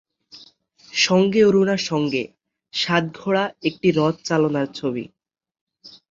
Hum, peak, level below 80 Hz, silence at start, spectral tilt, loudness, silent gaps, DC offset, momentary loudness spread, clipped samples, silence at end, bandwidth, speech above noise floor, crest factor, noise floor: none; -2 dBFS; -62 dBFS; 0.35 s; -5 dB/octave; -20 LUFS; 5.61-5.67 s; under 0.1%; 12 LU; under 0.1%; 0.25 s; 7.8 kHz; 32 dB; 20 dB; -52 dBFS